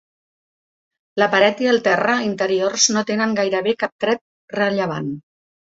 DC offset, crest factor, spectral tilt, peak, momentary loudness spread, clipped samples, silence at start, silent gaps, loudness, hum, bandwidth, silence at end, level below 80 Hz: under 0.1%; 20 dB; -3 dB/octave; 0 dBFS; 11 LU; under 0.1%; 1.15 s; 3.92-3.99 s, 4.21-4.48 s; -18 LUFS; none; 7.8 kHz; 0.5 s; -64 dBFS